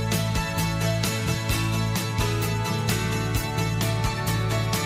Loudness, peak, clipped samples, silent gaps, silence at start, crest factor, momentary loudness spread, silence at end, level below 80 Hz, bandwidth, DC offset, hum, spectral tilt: -25 LUFS; -8 dBFS; under 0.1%; none; 0 s; 16 dB; 1 LU; 0 s; -36 dBFS; 15.5 kHz; under 0.1%; none; -4.5 dB/octave